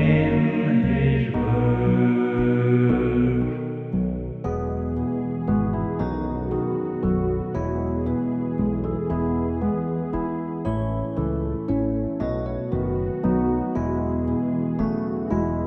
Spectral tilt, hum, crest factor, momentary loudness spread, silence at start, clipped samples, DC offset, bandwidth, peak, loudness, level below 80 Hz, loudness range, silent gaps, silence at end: -10.5 dB/octave; none; 16 dB; 7 LU; 0 s; under 0.1%; under 0.1%; 4.1 kHz; -6 dBFS; -24 LUFS; -36 dBFS; 5 LU; none; 0 s